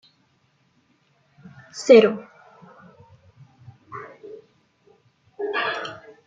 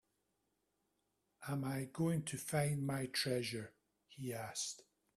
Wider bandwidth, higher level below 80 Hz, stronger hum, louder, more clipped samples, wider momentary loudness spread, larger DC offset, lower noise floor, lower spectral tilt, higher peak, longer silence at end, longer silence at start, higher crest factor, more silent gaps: second, 7.8 kHz vs 15.5 kHz; about the same, -72 dBFS vs -74 dBFS; neither; first, -19 LUFS vs -40 LUFS; neither; first, 27 LU vs 11 LU; neither; second, -65 dBFS vs -84 dBFS; about the same, -4.5 dB/octave vs -4.5 dB/octave; first, -2 dBFS vs -24 dBFS; about the same, 0.3 s vs 0.35 s; first, 1.75 s vs 1.4 s; about the same, 24 dB vs 20 dB; neither